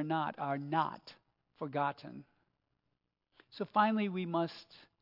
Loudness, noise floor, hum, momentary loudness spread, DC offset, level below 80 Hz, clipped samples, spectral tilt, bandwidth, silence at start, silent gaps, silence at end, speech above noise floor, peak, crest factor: -35 LUFS; -84 dBFS; none; 21 LU; under 0.1%; -86 dBFS; under 0.1%; -4.5 dB/octave; 5.8 kHz; 0 s; none; 0.25 s; 49 dB; -16 dBFS; 22 dB